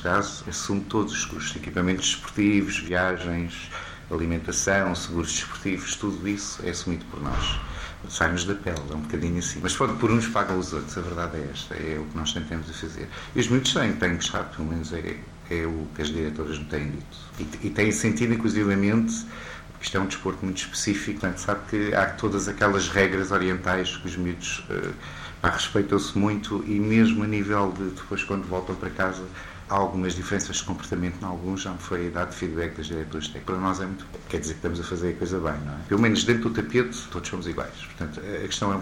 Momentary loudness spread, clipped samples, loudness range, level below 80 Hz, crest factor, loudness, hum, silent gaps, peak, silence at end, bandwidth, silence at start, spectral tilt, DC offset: 11 LU; under 0.1%; 5 LU; -42 dBFS; 20 dB; -26 LUFS; none; none; -6 dBFS; 0 s; 16.5 kHz; 0 s; -4.5 dB/octave; under 0.1%